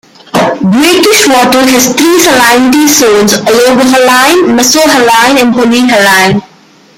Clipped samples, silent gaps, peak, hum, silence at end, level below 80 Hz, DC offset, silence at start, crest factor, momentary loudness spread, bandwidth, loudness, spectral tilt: 0.6%; none; 0 dBFS; none; 0.55 s; -42 dBFS; under 0.1%; 0.35 s; 6 dB; 4 LU; over 20 kHz; -5 LUFS; -3 dB/octave